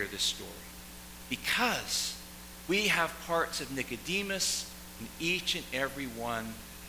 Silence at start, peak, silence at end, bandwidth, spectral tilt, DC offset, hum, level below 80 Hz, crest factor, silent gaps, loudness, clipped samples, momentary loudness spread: 0 s; -14 dBFS; 0 s; 16 kHz; -2 dB/octave; under 0.1%; none; -54 dBFS; 20 dB; none; -32 LUFS; under 0.1%; 16 LU